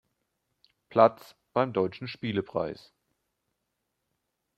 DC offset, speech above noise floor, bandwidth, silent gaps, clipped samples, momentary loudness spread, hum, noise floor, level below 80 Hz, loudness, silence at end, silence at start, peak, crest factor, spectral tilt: under 0.1%; 54 dB; 14 kHz; none; under 0.1%; 13 LU; none; -81 dBFS; -70 dBFS; -28 LUFS; 1.85 s; 0.9 s; -4 dBFS; 26 dB; -7.5 dB/octave